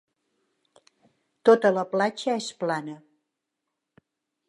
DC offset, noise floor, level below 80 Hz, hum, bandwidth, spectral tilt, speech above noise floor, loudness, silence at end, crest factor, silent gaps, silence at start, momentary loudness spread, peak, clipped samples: under 0.1%; -83 dBFS; -82 dBFS; none; 11 kHz; -5 dB/octave; 60 dB; -24 LUFS; 1.5 s; 22 dB; none; 1.45 s; 15 LU; -6 dBFS; under 0.1%